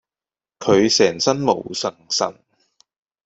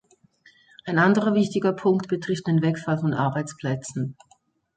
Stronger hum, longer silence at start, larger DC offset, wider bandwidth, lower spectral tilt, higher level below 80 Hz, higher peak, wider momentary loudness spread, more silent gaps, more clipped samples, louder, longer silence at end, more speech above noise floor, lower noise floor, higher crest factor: neither; second, 0.6 s vs 0.85 s; neither; second, 8.2 kHz vs 9.4 kHz; second, -3.5 dB/octave vs -7 dB/octave; first, -58 dBFS vs -64 dBFS; first, -2 dBFS vs -6 dBFS; about the same, 11 LU vs 11 LU; neither; neither; first, -19 LUFS vs -24 LUFS; first, 0.95 s vs 0.65 s; first, over 72 dB vs 40 dB; first, under -90 dBFS vs -62 dBFS; about the same, 20 dB vs 18 dB